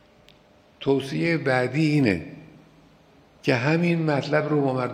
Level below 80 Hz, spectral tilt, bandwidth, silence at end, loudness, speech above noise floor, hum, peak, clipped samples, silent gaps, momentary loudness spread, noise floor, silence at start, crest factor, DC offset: -62 dBFS; -7 dB/octave; 11.5 kHz; 0 s; -23 LUFS; 33 dB; none; -6 dBFS; under 0.1%; none; 7 LU; -56 dBFS; 0.8 s; 20 dB; under 0.1%